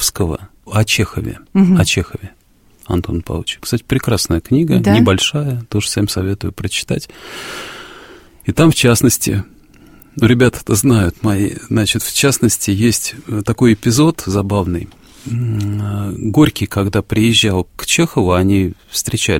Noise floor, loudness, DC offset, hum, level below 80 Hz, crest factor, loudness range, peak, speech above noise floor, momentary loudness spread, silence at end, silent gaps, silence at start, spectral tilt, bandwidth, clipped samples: -47 dBFS; -15 LUFS; under 0.1%; none; -36 dBFS; 16 dB; 3 LU; 0 dBFS; 33 dB; 13 LU; 0 s; none; 0 s; -4.5 dB/octave; 16.5 kHz; under 0.1%